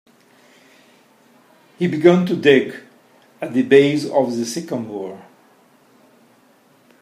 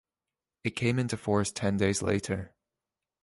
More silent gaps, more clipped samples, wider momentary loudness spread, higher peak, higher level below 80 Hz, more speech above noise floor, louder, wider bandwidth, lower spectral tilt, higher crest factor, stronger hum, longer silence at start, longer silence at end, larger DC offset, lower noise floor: neither; neither; first, 17 LU vs 9 LU; first, 0 dBFS vs -12 dBFS; second, -68 dBFS vs -52 dBFS; second, 38 dB vs over 61 dB; first, -17 LUFS vs -30 LUFS; first, 13 kHz vs 11.5 kHz; about the same, -6 dB/octave vs -5 dB/octave; about the same, 20 dB vs 20 dB; neither; first, 1.8 s vs 0.65 s; first, 1.8 s vs 0.75 s; neither; second, -54 dBFS vs under -90 dBFS